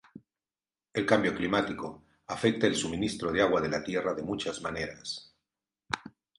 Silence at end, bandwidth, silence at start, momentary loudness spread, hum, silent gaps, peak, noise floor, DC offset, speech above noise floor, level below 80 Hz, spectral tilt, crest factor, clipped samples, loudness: 0.3 s; 11.5 kHz; 0.15 s; 13 LU; none; none; -8 dBFS; under -90 dBFS; under 0.1%; over 60 dB; -58 dBFS; -4.5 dB/octave; 22 dB; under 0.1%; -30 LUFS